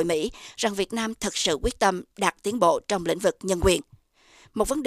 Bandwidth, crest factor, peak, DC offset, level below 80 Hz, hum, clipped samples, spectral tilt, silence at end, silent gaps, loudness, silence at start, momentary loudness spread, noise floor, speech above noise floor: 15.5 kHz; 22 dB; -4 dBFS; under 0.1%; -42 dBFS; none; under 0.1%; -3.5 dB/octave; 0 s; none; -25 LUFS; 0 s; 6 LU; -57 dBFS; 32 dB